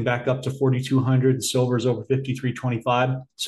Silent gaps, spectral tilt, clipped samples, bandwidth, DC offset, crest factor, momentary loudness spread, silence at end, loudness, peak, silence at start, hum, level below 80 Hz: none; -6 dB/octave; under 0.1%; 12.5 kHz; under 0.1%; 14 dB; 6 LU; 0 s; -23 LUFS; -8 dBFS; 0 s; none; -62 dBFS